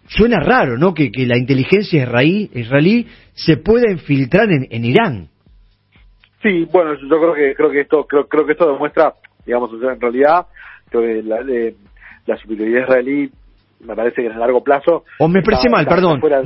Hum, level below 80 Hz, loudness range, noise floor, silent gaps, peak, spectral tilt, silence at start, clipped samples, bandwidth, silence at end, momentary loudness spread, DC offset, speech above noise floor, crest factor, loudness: none; -40 dBFS; 4 LU; -49 dBFS; none; 0 dBFS; -9.5 dB/octave; 0.1 s; under 0.1%; 5.8 kHz; 0 s; 8 LU; under 0.1%; 35 dB; 14 dB; -15 LUFS